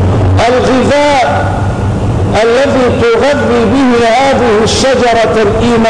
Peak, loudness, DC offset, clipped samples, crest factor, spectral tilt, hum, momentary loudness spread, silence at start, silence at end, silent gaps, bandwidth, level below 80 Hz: -2 dBFS; -9 LUFS; 1%; under 0.1%; 6 dB; -5.5 dB/octave; none; 4 LU; 0 s; 0 s; none; 10.5 kHz; -26 dBFS